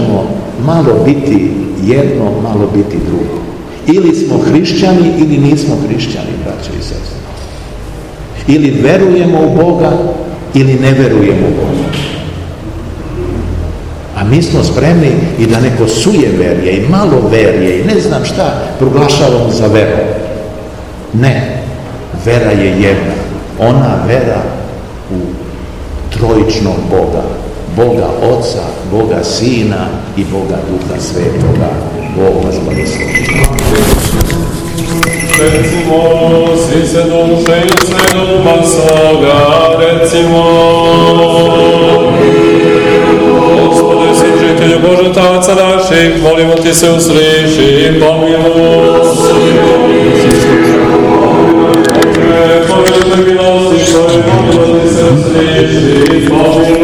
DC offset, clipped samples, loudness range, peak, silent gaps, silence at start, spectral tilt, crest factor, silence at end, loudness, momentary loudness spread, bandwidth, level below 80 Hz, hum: 0.9%; 4%; 6 LU; 0 dBFS; none; 0 s; -5.5 dB/octave; 8 dB; 0 s; -8 LUFS; 12 LU; over 20 kHz; -26 dBFS; none